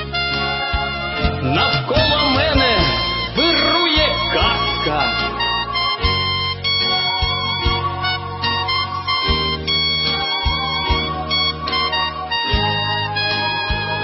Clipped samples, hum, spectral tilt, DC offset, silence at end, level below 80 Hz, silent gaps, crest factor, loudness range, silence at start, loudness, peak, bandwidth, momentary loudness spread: under 0.1%; none; -7 dB/octave; under 0.1%; 0 s; -30 dBFS; none; 16 dB; 3 LU; 0 s; -17 LUFS; -2 dBFS; 6 kHz; 6 LU